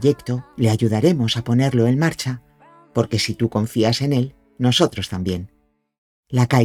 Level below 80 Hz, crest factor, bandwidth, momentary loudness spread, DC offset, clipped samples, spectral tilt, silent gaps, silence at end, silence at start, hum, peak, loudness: -50 dBFS; 18 dB; 14.5 kHz; 10 LU; under 0.1%; under 0.1%; -6 dB/octave; 5.98-6.23 s; 0 s; 0 s; none; -2 dBFS; -20 LUFS